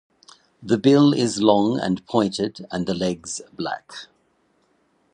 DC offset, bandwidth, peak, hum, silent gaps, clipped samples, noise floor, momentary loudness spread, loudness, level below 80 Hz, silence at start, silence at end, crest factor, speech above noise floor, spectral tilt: under 0.1%; 10.5 kHz; -2 dBFS; none; none; under 0.1%; -65 dBFS; 16 LU; -21 LUFS; -58 dBFS; 0.6 s; 1.1 s; 20 dB; 44 dB; -5.5 dB/octave